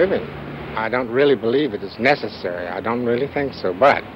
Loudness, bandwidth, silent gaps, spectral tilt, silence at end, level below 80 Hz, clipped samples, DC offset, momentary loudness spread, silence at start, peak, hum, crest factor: -20 LUFS; 7.6 kHz; none; -7 dB/octave; 0 s; -50 dBFS; under 0.1%; under 0.1%; 10 LU; 0 s; -2 dBFS; none; 18 dB